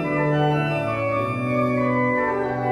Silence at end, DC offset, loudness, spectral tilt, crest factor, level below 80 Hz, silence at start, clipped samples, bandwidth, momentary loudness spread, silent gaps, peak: 0 s; under 0.1%; -22 LUFS; -8 dB/octave; 12 dB; -52 dBFS; 0 s; under 0.1%; 12 kHz; 3 LU; none; -10 dBFS